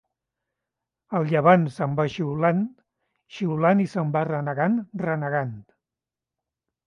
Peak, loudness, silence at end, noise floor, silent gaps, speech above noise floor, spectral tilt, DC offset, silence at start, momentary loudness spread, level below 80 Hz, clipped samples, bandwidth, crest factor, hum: -4 dBFS; -23 LUFS; 1.25 s; -89 dBFS; none; 66 dB; -8.5 dB/octave; under 0.1%; 1.1 s; 11 LU; -64 dBFS; under 0.1%; 10 kHz; 22 dB; none